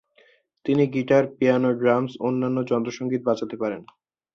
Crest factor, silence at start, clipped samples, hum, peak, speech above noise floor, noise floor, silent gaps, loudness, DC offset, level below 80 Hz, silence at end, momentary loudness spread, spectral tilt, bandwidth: 18 dB; 0.65 s; under 0.1%; none; -6 dBFS; 37 dB; -59 dBFS; none; -23 LUFS; under 0.1%; -64 dBFS; 0.5 s; 9 LU; -7.5 dB/octave; 7 kHz